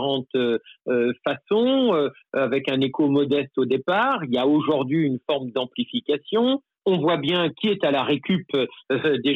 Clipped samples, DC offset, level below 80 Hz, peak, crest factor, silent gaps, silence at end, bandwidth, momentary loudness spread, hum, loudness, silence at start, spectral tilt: under 0.1%; under 0.1%; -70 dBFS; -10 dBFS; 12 dB; none; 0 s; 5.6 kHz; 6 LU; none; -23 LUFS; 0 s; -8 dB/octave